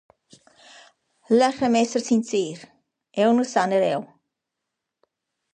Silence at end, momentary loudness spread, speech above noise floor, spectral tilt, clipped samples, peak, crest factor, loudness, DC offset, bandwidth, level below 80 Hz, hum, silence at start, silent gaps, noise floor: 1.5 s; 11 LU; 62 dB; -4.5 dB/octave; under 0.1%; -6 dBFS; 18 dB; -22 LUFS; under 0.1%; 9.6 kHz; -70 dBFS; none; 1.3 s; none; -83 dBFS